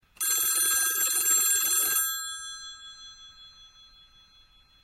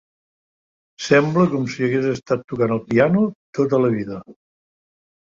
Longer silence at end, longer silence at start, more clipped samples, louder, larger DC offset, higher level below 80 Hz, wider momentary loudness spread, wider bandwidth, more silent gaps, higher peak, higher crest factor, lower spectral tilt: first, 1.2 s vs 0.9 s; second, 0.2 s vs 1 s; neither; second, -23 LUFS vs -19 LUFS; neither; second, -66 dBFS vs -58 dBFS; first, 22 LU vs 9 LU; first, 16 kHz vs 7.6 kHz; second, none vs 2.44-2.48 s, 3.35-3.53 s; second, -12 dBFS vs -2 dBFS; about the same, 16 dB vs 18 dB; second, 3 dB/octave vs -7 dB/octave